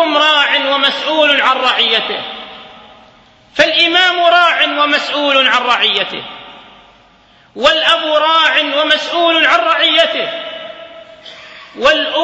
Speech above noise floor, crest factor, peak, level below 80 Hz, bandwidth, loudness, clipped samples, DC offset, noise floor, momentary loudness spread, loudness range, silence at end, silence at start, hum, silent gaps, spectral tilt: 35 dB; 14 dB; 0 dBFS; -54 dBFS; 11 kHz; -11 LUFS; under 0.1%; under 0.1%; -47 dBFS; 17 LU; 3 LU; 0 s; 0 s; none; none; -1.5 dB/octave